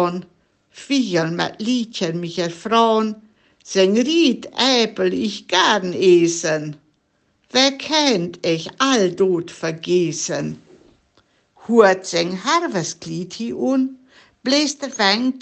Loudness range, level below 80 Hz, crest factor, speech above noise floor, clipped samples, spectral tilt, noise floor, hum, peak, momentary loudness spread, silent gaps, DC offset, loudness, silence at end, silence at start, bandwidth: 4 LU; -66 dBFS; 18 dB; 46 dB; under 0.1%; -4 dB/octave; -65 dBFS; none; 0 dBFS; 11 LU; none; under 0.1%; -19 LUFS; 0 s; 0 s; 8.8 kHz